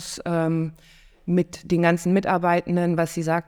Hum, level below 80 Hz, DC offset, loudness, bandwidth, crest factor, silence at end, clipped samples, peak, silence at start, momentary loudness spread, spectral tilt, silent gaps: none; -54 dBFS; under 0.1%; -23 LUFS; 14.5 kHz; 18 dB; 0.05 s; under 0.1%; -4 dBFS; 0 s; 6 LU; -6.5 dB/octave; none